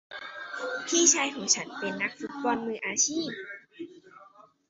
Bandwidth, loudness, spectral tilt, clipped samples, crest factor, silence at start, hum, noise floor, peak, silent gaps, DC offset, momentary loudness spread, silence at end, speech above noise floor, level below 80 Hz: 8.2 kHz; -27 LUFS; -1 dB/octave; under 0.1%; 24 dB; 0.1 s; none; -56 dBFS; -6 dBFS; none; under 0.1%; 21 LU; 0.4 s; 27 dB; -74 dBFS